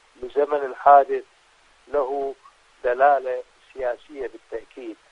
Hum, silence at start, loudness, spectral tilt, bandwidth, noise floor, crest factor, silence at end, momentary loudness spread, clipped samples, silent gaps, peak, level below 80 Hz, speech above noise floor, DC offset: none; 0.2 s; -22 LUFS; -5 dB/octave; 6.8 kHz; -57 dBFS; 20 dB; 0.2 s; 21 LU; under 0.1%; none; -4 dBFS; -58 dBFS; 36 dB; under 0.1%